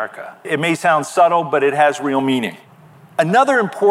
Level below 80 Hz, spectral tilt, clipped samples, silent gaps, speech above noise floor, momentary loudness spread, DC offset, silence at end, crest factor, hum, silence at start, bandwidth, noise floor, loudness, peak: -74 dBFS; -5 dB/octave; under 0.1%; none; 28 dB; 12 LU; under 0.1%; 0 s; 14 dB; none; 0 s; 15 kHz; -44 dBFS; -16 LUFS; -2 dBFS